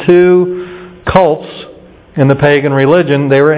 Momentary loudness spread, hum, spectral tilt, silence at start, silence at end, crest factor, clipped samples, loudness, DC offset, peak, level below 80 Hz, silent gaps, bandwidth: 17 LU; none; -11.5 dB/octave; 0 s; 0 s; 10 dB; 1%; -10 LUFS; under 0.1%; 0 dBFS; -38 dBFS; none; 4 kHz